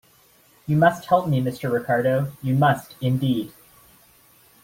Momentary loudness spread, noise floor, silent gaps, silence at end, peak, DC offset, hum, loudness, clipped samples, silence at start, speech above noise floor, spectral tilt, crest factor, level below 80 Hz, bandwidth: 7 LU; -56 dBFS; none; 1.15 s; -4 dBFS; under 0.1%; none; -22 LUFS; under 0.1%; 0.7 s; 35 dB; -7.5 dB/octave; 18 dB; -58 dBFS; 16.5 kHz